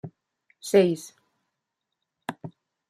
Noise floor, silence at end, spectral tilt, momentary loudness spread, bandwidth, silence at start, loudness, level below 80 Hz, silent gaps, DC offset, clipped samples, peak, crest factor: -83 dBFS; 0.4 s; -5.5 dB/octave; 24 LU; 14 kHz; 0.05 s; -23 LUFS; -72 dBFS; none; under 0.1%; under 0.1%; -6 dBFS; 22 dB